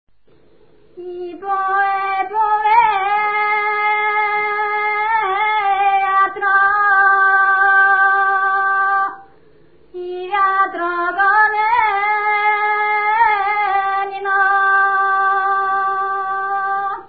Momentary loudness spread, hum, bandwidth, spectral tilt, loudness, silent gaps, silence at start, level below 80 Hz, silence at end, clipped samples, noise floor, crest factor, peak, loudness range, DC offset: 8 LU; none; 4.9 kHz; -7 dB/octave; -15 LUFS; none; 0.95 s; -58 dBFS; 0.05 s; under 0.1%; -54 dBFS; 16 dB; -2 dBFS; 4 LU; 0.4%